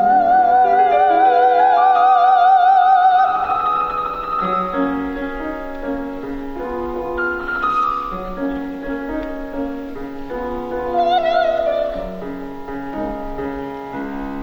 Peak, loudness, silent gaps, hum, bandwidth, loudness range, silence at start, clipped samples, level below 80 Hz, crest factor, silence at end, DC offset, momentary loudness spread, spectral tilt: -4 dBFS; -17 LUFS; none; none; 6.4 kHz; 10 LU; 0 s; under 0.1%; -38 dBFS; 14 dB; 0 s; under 0.1%; 15 LU; -6.5 dB/octave